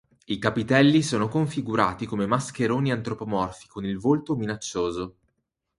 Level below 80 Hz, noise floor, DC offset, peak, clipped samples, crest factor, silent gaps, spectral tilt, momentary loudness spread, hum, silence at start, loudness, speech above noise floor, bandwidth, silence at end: -54 dBFS; -77 dBFS; under 0.1%; -4 dBFS; under 0.1%; 22 dB; none; -6 dB/octave; 12 LU; none; 0.3 s; -25 LUFS; 53 dB; 11.5 kHz; 0.7 s